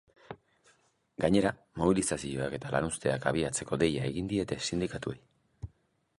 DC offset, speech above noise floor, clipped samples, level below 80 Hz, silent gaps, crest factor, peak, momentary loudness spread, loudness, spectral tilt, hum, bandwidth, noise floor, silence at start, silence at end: under 0.1%; 41 dB; under 0.1%; -54 dBFS; none; 22 dB; -10 dBFS; 21 LU; -31 LUFS; -5 dB/octave; none; 11.5 kHz; -71 dBFS; 0.3 s; 0.5 s